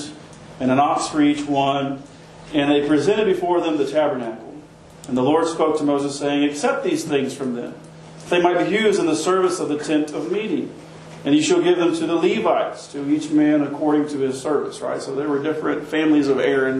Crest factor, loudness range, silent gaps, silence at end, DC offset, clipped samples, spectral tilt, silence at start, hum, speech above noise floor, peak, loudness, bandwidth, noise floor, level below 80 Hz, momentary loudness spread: 18 dB; 2 LU; none; 0 s; under 0.1%; under 0.1%; -5 dB/octave; 0 s; none; 22 dB; -2 dBFS; -20 LUFS; 12 kHz; -42 dBFS; -58 dBFS; 11 LU